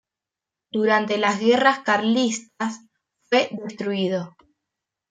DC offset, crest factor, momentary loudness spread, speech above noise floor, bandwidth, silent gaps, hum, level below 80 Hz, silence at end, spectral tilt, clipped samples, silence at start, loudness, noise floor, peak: under 0.1%; 20 dB; 12 LU; 66 dB; 9.4 kHz; none; none; -72 dBFS; 0.8 s; -4 dB/octave; under 0.1%; 0.75 s; -22 LUFS; -88 dBFS; -4 dBFS